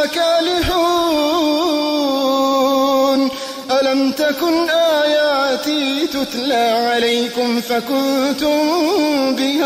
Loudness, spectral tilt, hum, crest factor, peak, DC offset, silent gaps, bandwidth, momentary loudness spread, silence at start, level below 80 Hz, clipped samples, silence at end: -16 LUFS; -3 dB/octave; none; 10 dB; -6 dBFS; under 0.1%; none; 16 kHz; 4 LU; 0 s; -44 dBFS; under 0.1%; 0 s